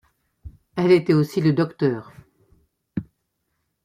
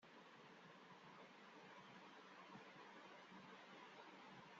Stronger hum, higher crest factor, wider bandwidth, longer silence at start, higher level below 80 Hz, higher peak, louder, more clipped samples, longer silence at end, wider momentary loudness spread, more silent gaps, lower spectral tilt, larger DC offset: neither; about the same, 18 dB vs 14 dB; first, 15 kHz vs 7.4 kHz; first, 0.45 s vs 0 s; first, -54 dBFS vs under -90 dBFS; first, -6 dBFS vs -48 dBFS; first, -20 LUFS vs -62 LUFS; neither; first, 0.8 s vs 0 s; first, 16 LU vs 3 LU; neither; first, -8 dB/octave vs -2.5 dB/octave; neither